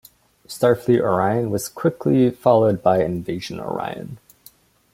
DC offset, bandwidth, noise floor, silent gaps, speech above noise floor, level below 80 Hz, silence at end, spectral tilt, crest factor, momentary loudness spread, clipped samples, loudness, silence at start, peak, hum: under 0.1%; 16.5 kHz; -52 dBFS; none; 33 dB; -56 dBFS; 0.75 s; -6.5 dB/octave; 18 dB; 12 LU; under 0.1%; -20 LUFS; 0.5 s; -2 dBFS; none